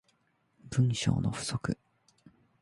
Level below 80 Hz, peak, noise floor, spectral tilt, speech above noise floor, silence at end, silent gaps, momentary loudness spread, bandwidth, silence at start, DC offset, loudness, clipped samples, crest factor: -54 dBFS; -14 dBFS; -72 dBFS; -5.5 dB/octave; 43 dB; 0.85 s; none; 9 LU; 11.5 kHz; 0.65 s; under 0.1%; -32 LUFS; under 0.1%; 20 dB